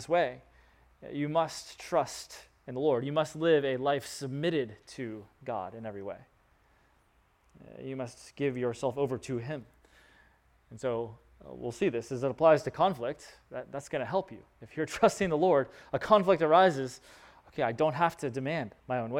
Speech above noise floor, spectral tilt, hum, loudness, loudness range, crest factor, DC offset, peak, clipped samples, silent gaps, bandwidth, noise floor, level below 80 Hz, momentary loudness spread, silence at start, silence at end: 37 dB; -5.5 dB/octave; none; -30 LUFS; 11 LU; 22 dB; under 0.1%; -10 dBFS; under 0.1%; none; 16 kHz; -68 dBFS; -64 dBFS; 19 LU; 0 s; 0 s